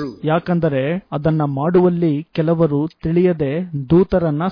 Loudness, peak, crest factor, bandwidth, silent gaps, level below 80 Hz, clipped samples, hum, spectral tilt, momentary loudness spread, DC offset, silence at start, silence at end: -18 LUFS; -4 dBFS; 12 dB; 5.2 kHz; none; -42 dBFS; under 0.1%; none; -11 dB/octave; 6 LU; under 0.1%; 0 s; 0 s